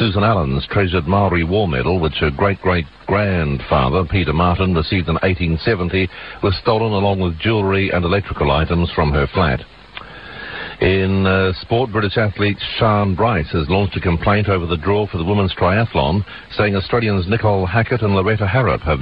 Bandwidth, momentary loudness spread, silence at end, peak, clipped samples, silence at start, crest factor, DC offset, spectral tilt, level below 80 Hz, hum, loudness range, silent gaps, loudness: 5.2 kHz; 4 LU; 0 s; -2 dBFS; under 0.1%; 0 s; 14 dB; 0.2%; -10 dB/octave; -32 dBFS; none; 1 LU; none; -17 LUFS